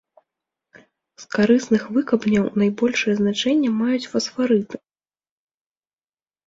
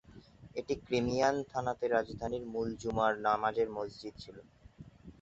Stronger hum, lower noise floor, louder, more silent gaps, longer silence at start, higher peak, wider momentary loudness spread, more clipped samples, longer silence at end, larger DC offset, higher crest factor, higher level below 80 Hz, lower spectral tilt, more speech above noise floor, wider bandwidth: neither; first, under -90 dBFS vs -56 dBFS; first, -20 LUFS vs -34 LUFS; neither; first, 1.2 s vs 0.15 s; first, -4 dBFS vs -14 dBFS; second, 6 LU vs 16 LU; neither; first, 1.7 s vs 0.1 s; neither; about the same, 18 dB vs 20 dB; about the same, -60 dBFS vs -58 dBFS; about the same, -5.5 dB/octave vs -4.5 dB/octave; first, over 70 dB vs 22 dB; about the same, 7.8 kHz vs 8 kHz